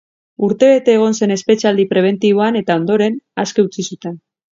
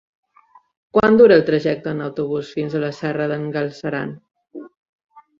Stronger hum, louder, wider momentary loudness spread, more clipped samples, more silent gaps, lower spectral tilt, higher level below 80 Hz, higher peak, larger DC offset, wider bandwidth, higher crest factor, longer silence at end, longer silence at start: neither; first, -14 LUFS vs -18 LUFS; second, 13 LU vs 17 LU; neither; second, none vs 4.77-5.09 s; second, -5.5 dB/octave vs -7.5 dB/octave; second, -62 dBFS vs -56 dBFS; about the same, 0 dBFS vs -2 dBFS; neither; about the same, 7.6 kHz vs 7.2 kHz; about the same, 14 dB vs 18 dB; first, 0.35 s vs 0.2 s; second, 0.4 s vs 0.95 s